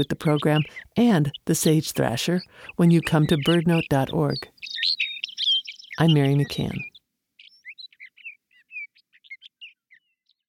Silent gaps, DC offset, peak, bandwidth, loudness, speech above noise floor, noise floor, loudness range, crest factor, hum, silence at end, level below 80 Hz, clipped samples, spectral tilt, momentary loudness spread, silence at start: none; under 0.1%; -8 dBFS; 17 kHz; -22 LUFS; 50 dB; -71 dBFS; 17 LU; 16 dB; none; 0.8 s; -54 dBFS; under 0.1%; -5.5 dB/octave; 21 LU; 0 s